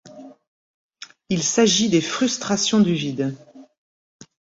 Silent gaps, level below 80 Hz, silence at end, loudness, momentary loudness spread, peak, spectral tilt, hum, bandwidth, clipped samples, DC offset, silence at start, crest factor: 0.47-0.89 s; -60 dBFS; 0.95 s; -20 LUFS; 24 LU; -4 dBFS; -4 dB/octave; none; 8 kHz; under 0.1%; under 0.1%; 0.05 s; 18 dB